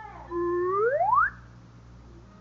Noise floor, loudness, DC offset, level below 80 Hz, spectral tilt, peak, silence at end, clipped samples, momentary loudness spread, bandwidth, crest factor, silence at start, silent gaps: -49 dBFS; -26 LUFS; under 0.1%; -52 dBFS; -6 dB/octave; -12 dBFS; 0.2 s; under 0.1%; 8 LU; 6.8 kHz; 16 dB; 0 s; none